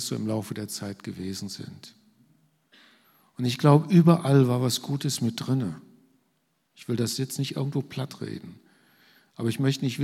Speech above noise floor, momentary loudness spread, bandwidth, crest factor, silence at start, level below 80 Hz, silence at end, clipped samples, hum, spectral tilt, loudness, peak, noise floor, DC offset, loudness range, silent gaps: 47 dB; 18 LU; 15.5 kHz; 22 dB; 0 s; -70 dBFS; 0 s; under 0.1%; none; -6 dB/octave; -26 LUFS; -6 dBFS; -72 dBFS; under 0.1%; 10 LU; none